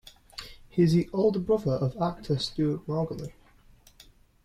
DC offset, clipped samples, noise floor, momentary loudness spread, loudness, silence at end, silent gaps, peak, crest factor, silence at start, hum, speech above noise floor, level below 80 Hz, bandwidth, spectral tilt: under 0.1%; under 0.1%; -57 dBFS; 19 LU; -27 LUFS; 1.15 s; none; -12 dBFS; 16 dB; 0.35 s; none; 30 dB; -52 dBFS; 13.5 kHz; -7.5 dB/octave